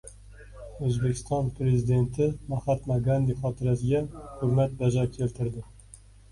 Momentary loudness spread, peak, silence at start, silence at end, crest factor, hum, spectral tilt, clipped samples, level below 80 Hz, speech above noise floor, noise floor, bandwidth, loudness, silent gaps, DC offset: 11 LU; -12 dBFS; 0.05 s; 0.35 s; 14 dB; 50 Hz at -45 dBFS; -8 dB/octave; under 0.1%; -46 dBFS; 25 dB; -51 dBFS; 11.5 kHz; -27 LUFS; none; under 0.1%